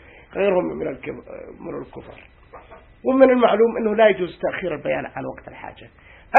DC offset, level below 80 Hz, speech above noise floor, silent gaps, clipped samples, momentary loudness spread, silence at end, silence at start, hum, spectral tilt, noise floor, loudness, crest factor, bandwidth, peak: under 0.1%; -52 dBFS; 23 dB; none; under 0.1%; 22 LU; 0 s; 0.35 s; none; -8 dB/octave; -44 dBFS; -19 LUFS; 22 dB; 4.2 kHz; 0 dBFS